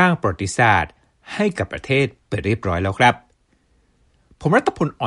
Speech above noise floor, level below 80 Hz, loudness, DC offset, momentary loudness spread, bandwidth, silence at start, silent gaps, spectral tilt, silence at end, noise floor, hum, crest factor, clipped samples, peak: 42 dB; -46 dBFS; -19 LUFS; under 0.1%; 11 LU; 11.5 kHz; 0 s; none; -5.5 dB/octave; 0 s; -61 dBFS; none; 18 dB; under 0.1%; -2 dBFS